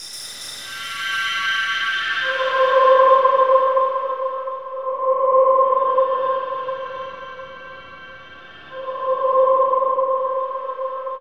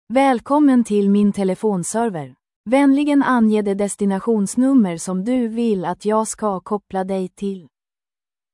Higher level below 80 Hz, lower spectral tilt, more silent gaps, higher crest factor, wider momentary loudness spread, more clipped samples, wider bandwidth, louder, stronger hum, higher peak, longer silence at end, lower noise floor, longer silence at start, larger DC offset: second, -66 dBFS vs -58 dBFS; second, -1 dB/octave vs -6 dB/octave; second, none vs 2.56-2.64 s; about the same, 18 dB vs 14 dB; first, 21 LU vs 10 LU; neither; first, 13.5 kHz vs 12 kHz; about the same, -18 LUFS vs -18 LUFS; neither; about the same, -2 dBFS vs -4 dBFS; second, 0 s vs 0.9 s; second, -41 dBFS vs under -90 dBFS; about the same, 0 s vs 0.1 s; first, 0.3% vs under 0.1%